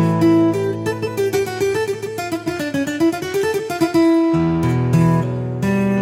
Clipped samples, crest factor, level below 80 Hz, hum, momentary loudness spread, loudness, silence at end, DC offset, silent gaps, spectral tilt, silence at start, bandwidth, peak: under 0.1%; 14 dB; -46 dBFS; none; 8 LU; -18 LUFS; 0 s; under 0.1%; none; -7 dB/octave; 0 s; 16 kHz; -4 dBFS